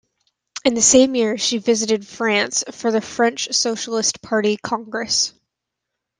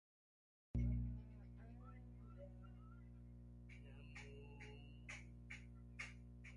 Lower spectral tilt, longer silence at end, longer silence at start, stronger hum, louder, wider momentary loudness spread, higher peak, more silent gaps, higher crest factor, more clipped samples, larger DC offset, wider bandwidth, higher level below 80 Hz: second, -2 dB/octave vs -6.5 dB/octave; first, 0.9 s vs 0 s; second, 0.55 s vs 0.75 s; second, none vs 60 Hz at -55 dBFS; first, -18 LUFS vs -54 LUFS; second, 9 LU vs 15 LU; first, -2 dBFS vs -34 dBFS; neither; about the same, 18 dB vs 18 dB; neither; neither; about the same, 11 kHz vs 11 kHz; about the same, -60 dBFS vs -56 dBFS